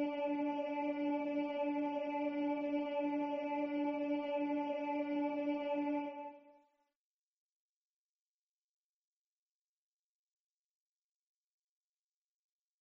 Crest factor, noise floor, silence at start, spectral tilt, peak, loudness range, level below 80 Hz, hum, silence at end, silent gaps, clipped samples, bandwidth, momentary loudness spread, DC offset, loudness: 14 dB; under -90 dBFS; 0 s; -3 dB/octave; -28 dBFS; 7 LU; -86 dBFS; none; 6.3 s; none; under 0.1%; 5.8 kHz; 1 LU; under 0.1%; -38 LUFS